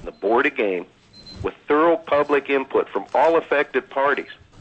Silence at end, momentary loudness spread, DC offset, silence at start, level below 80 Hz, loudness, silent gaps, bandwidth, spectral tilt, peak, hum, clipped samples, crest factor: 0.25 s; 13 LU; under 0.1%; 0 s; -52 dBFS; -21 LUFS; none; 8.2 kHz; -6 dB/octave; -6 dBFS; none; under 0.1%; 14 dB